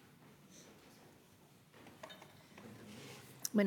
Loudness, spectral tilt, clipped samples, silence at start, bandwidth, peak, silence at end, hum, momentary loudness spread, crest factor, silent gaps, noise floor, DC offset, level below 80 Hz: -50 LUFS; -4.5 dB/octave; under 0.1%; 0.05 s; 19 kHz; -20 dBFS; 0 s; none; 13 LU; 24 dB; none; -65 dBFS; under 0.1%; -84 dBFS